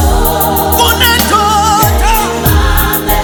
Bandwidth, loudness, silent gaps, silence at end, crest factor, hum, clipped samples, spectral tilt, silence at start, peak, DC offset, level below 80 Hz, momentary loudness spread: over 20 kHz; -9 LUFS; none; 0 s; 10 dB; none; 0.2%; -3.5 dB/octave; 0 s; 0 dBFS; under 0.1%; -16 dBFS; 4 LU